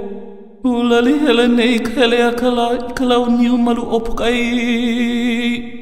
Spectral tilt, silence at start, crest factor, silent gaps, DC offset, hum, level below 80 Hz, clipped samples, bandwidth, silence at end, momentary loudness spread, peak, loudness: -4.5 dB/octave; 0 s; 14 dB; none; 3%; none; -36 dBFS; under 0.1%; 14.5 kHz; 0 s; 6 LU; -2 dBFS; -15 LUFS